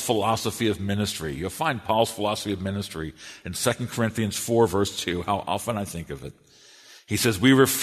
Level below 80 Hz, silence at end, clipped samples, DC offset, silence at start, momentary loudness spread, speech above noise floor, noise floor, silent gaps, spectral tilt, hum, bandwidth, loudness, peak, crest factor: -52 dBFS; 0 s; under 0.1%; under 0.1%; 0 s; 13 LU; 26 dB; -51 dBFS; none; -4.5 dB/octave; none; 13.5 kHz; -25 LUFS; -4 dBFS; 22 dB